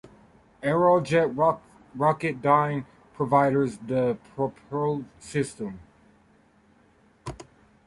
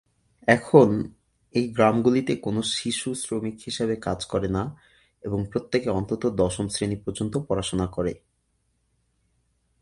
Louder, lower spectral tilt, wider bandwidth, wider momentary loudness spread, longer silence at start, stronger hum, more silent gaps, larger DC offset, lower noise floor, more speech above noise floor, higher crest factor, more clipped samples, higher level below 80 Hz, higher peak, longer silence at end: about the same, -25 LUFS vs -25 LUFS; first, -7 dB/octave vs -5.5 dB/octave; about the same, 11.5 kHz vs 11.5 kHz; first, 20 LU vs 11 LU; second, 0.05 s vs 0.45 s; neither; neither; neither; second, -60 dBFS vs -71 dBFS; second, 36 dB vs 47 dB; about the same, 20 dB vs 24 dB; neither; second, -58 dBFS vs -48 dBFS; second, -6 dBFS vs -2 dBFS; second, 0.45 s vs 1.65 s